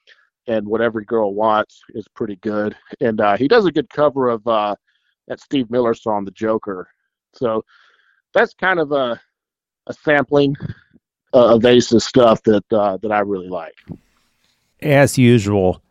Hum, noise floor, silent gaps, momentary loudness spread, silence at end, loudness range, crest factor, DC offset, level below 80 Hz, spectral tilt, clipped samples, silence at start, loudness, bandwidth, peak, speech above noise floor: none; -87 dBFS; none; 16 LU; 0.15 s; 7 LU; 18 dB; under 0.1%; -52 dBFS; -6 dB/octave; under 0.1%; 0.45 s; -17 LUFS; 14.5 kHz; 0 dBFS; 70 dB